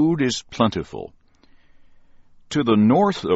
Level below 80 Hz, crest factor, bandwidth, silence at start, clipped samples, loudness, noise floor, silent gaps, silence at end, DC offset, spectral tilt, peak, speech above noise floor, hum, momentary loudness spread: -52 dBFS; 16 dB; 8 kHz; 0 s; under 0.1%; -20 LUFS; -52 dBFS; none; 0 s; under 0.1%; -5.5 dB/octave; -4 dBFS; 33 dB; none; 18 LU